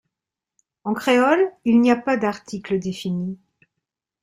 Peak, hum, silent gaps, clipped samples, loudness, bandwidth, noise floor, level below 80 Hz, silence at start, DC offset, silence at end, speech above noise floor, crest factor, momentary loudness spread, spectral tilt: -6 dBFS; none; none; under 0.1%; -20 LUFS; 15 kHz; -87 dBFS; -62 dBFS; 0.85 s; under 0.1%; 0.85 s; 67 dB; 16 dB; 15 LU; -6 dB/octave